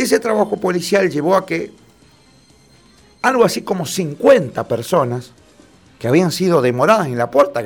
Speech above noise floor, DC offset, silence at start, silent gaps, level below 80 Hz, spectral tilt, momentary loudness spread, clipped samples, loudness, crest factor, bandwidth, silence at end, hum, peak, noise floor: 34 dB; under 0.1%; 0 s; none; -56 dBFS; -5.5 dB/octave; 9 LU; under 0.1%; -16 LUFS; 16 dB; 19.5 kHz; 0 s; none; 0 dBFS; -50 dBFS